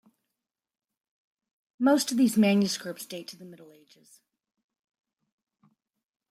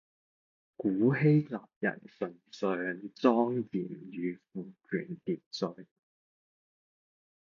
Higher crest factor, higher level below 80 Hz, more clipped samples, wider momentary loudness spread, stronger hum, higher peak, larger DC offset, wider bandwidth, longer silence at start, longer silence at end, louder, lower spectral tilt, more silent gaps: about the same, 20 dB vs 22 dB; about the same, -78 dBFS vs -74 dBFS; neither; first, 18 LU vs 14 LU; neither; about the same, -12 dBFS vs -10 dBFS; neither; first, 15.5 kHz vs 7.2 kHz; first, 1.8 s vs 0.8 s; first, 2.7 s vs 1.55 s; first, -25 LUFS vs -32 LUFS; second, -4.5 dB/octave vs -8 dB/octave; second, none vs 1.76-1.81 s, 5.46-5.51 s